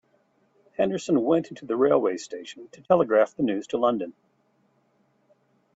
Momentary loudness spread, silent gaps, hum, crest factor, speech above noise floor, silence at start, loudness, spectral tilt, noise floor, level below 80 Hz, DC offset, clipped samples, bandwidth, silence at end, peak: 17 LU; none; none; 20 dB; 43 dB; 0.8 s; -24 LUFS; -6 dB/octave; -67 dBFS; -68 dBFS; under 0.1%; under 0.1%; 8 kHz; 1.65 s; -6 dBFS